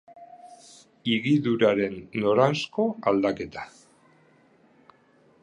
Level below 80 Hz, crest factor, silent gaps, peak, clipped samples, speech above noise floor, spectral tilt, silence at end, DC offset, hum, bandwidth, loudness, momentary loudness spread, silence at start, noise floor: -64 dBFS; 22 dB; none; -6 dBFS; under 0.1%; 36 dB; -6.5 dB/octave; 1.75 s; under 0.1%; none; 11 kHz; -25 LUFS; 13 LU; 0.1 s; -60 dBFS